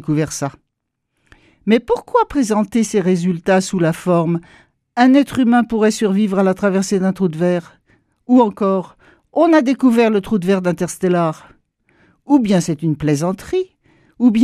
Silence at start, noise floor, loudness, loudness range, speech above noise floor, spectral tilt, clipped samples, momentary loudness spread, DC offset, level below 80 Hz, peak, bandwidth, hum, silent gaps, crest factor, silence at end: 0.05 s; -75 dBFS; -16 LUFS; 3 LU; 59 dB; -6.5 dB/octave; under 0.1%; 9 LU; under 0.1%; -50 dBFS; 0 dBFS; 14.5 kHz; none; none; 16 dB; 0 s